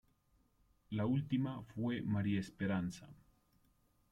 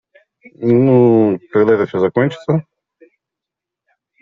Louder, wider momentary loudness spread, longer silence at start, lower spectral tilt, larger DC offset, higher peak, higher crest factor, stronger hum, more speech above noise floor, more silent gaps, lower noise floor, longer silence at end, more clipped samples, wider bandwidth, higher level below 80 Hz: second, -39 LUFS vs -14 LUFS; about the same, 8 LU vs 9 LU; first, 0.9 s vs 0.6 s; about the same, -7.5 dB/octave vs -8 dB/octave; neither; second, -24 dBFS vs -2 dBFS; about the same, 16 dB vs 14 dB; neither; second, 37 dB vs 71 dB; neither; second, -75 dBFS vs -84 dBFS; second, 1 s vs 1.6 s; neither; first, 12 kHz vs 7.2 kHz; second, -68 dBFS vs -58 dBFS